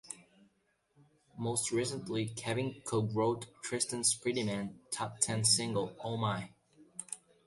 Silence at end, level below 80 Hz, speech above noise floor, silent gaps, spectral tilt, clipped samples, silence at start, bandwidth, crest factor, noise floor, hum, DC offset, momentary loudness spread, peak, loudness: 0.3 s; -70 dBFS; 41 dB; none; -3.5 dB/octave; under 0.1%; 0.05 s; 12 kHz; 24 dB; -75 dBFS; none; under 0.1%; 14 LU; -12 dBFS; -34 LUFS